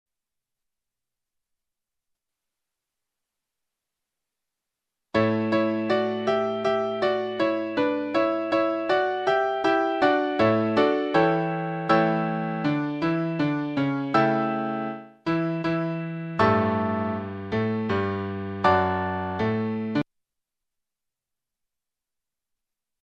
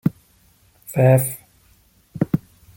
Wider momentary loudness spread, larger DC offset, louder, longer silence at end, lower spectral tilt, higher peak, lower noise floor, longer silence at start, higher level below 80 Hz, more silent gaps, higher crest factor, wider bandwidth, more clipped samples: second, 7 LU vs 17 LU; neither; second, -25 LUFS vs -20 LUFS; first, 3.1 s vs 0.4 s; about the same, -7.5 dB/octave vs -7.5 dB/octave; about the same, -6 dBFS vs -4 dBFS; first, -89 dBFS vs -56 dBFS; first, 5.15 s vs 0.05 s; second, -62 dBFS vs -52 dBFS; neither; about the same, 20 dB vs 18 dB; second, 8.4 kHz vs 17 kHz; neither